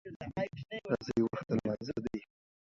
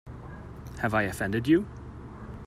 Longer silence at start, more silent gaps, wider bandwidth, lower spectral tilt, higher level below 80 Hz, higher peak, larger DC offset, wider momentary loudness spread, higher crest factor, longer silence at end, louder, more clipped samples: about the same, 0.05 s vs 0.05 s; first, 0.16-0.20 s vs none; second, 7.6 kHz vs 15 kHz; about the same, -7.5 dB/octave vs -6.5 dB/octave; second, -62 dBFS vs -48 dBFS; second, -16 dBFS vs -12 dBFS; neither; second, 9 LU vs 19 LU; about the same, 20 dB vs 18 dB; first, 0.5 s vs 0 s; second, -37 LUFS vs -27 LUFS; neither